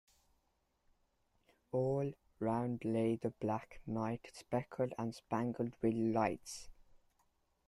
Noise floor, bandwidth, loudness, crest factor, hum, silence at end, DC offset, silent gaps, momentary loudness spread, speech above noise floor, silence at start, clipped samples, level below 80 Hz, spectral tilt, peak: -80 dBFS; 12.5 kHz; -39 LUFS; 20 dB; none; 0.95 s; under 0.1%; none; 8 LU; 42 dB; 1.75 s; under 0.1%; -68 dBFS; -7 dB/octave; -20 dBFS